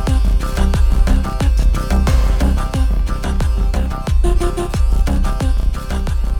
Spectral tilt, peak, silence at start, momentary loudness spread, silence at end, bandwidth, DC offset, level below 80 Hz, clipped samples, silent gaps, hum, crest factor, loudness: -6.5 dB/octave; -2 dBFS; 0 s; 5 LU; 0 s; 15 kHz; under 0.1%; -14 dBFS; under 0.1%; none; none; 12 dB; -18 LUFS